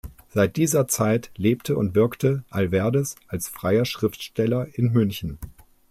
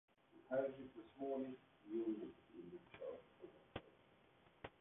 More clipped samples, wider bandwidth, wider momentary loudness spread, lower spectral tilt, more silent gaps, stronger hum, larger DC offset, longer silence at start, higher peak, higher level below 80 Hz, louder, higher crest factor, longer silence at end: neither; first, 16 kHz vs 3.8 kHz; second, 10 LU vs 16 LU; first, -6 dB/octave vs -4 dB/octave; neither; neither; neither; second, 0.05 s vs 0.35 s; first, -8 dBFS vs -30 dBFS; first, -50 dBFS vs -78 dBFS; first, -23 LUFS vs -49 LUFS; about the same, 16 dB vs 20 dB; first, 0.4 s vs 0.1 s